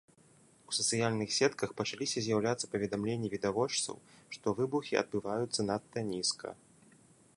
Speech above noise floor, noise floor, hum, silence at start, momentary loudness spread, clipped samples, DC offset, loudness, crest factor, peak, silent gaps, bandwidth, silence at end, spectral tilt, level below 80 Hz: 30 dB; -64 dBFS; none; 0.7 s; 8 LU; under 0.1%; under 0.1%; -34 LUFS; 20 dB; -14 dBFS; none; 11.5 kHz; 0.85 s; -3.5 dB/octave; -68 dBFS